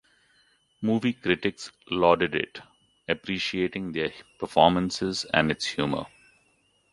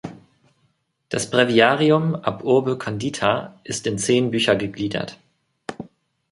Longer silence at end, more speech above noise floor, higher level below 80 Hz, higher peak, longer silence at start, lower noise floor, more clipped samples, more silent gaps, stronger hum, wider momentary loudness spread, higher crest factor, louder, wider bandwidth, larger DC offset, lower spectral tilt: first, 0.85 s vs 0.45 s; second, 41 dB vs 47 dB; about the same, -56 dBFS vs -58 dBFS; about the same, -2 dBFS vs -2 dBFS; first, 0.8 s vs 0.05 s; about the same, -67 dBFS vs -67 dBFS; neither; neither; neither; second, 13 LU vs 20 LU; about the same, 24 dB vs 20 dB; second, -26 LUFS vs -20 LUFS; about the same, 11.5 kHz vs 11.5 kHz; neither; about the same, -5 dB/octave vs -4.5 dB/octave